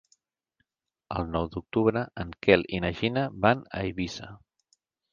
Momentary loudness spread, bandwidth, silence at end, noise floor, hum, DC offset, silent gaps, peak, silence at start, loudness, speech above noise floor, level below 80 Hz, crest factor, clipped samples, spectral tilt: 13 LU; 7.4 kHz; 0.75 s; -77 dBFS; none; under 0.1%; none; -4 dBFS; 1.1 s; -27 LUFS; 50 dB; -48 dBFS; 26 dB; under 0.1%; -6.5 dB/octave